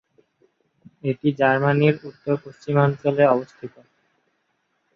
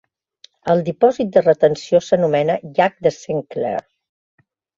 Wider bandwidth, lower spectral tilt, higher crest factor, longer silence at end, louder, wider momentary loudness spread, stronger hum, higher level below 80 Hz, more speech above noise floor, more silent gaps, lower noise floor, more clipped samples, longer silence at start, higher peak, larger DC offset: about the same, 7 kHz vs 7.6 kHz; first, -9 dB/octave vs -6.5 dB/octave; about the same, 20 dB vs 16 dB; first, 1.25 s vs 0.95 s; second, -21 LUFS vs -18 LUFS; first, 13 LU vs 9 LU; neither; about the same, -64 dBFS vs -60 dBFS; first, 50 dB vs 35 dB; neither; first, -71 dBFS vs -52 dBFS; neither; first, 1.05 s vs 0.65 s; about the same, -2 dBFS vs -2 dBFS; neither